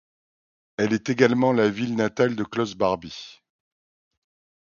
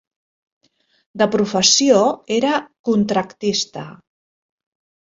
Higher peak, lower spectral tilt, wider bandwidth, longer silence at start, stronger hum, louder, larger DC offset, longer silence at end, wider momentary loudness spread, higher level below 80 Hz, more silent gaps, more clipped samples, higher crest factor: about the same, -2 dBFS vs -2 dBFS; first, -6 dB/octave vs -3 dB/octave; second, 7.2 kHz vs 8 kHz; second, 0.8 s vs 1.15 s; neither; second, -23 LUFS vs -17 LUFS; neither; first, 1.3 s vs 1.15 s; first, 18 LU vs 15 LU; about the same, -60 dBFS vs -60 dBFS; second, none vs 2.79-2.84 s; neither; about the same, 22 dB vs 18 dB